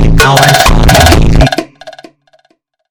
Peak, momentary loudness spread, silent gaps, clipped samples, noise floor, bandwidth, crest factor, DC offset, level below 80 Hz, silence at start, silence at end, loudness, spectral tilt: 0 dBFS; 9 LU; none; 7%; -55 dBFS; over 20 kHz; 8 dB; under 0.1%; -12 dBFS; 0 s; 1 s; -6 LUFS; -4.5 dB/octave